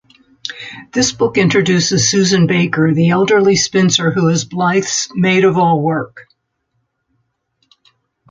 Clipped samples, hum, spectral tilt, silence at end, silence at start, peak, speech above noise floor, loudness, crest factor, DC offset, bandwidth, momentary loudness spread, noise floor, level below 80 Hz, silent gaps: under 0.1%; none; -4.5 dB/octave; 2.1 s; 0.45 s; -2 dBFS; 55 dB; -13 LUFS; 14 dB; under 0.1%; 9.2 kHz; 11 LU; -68 dBFS; -50 dBFS; none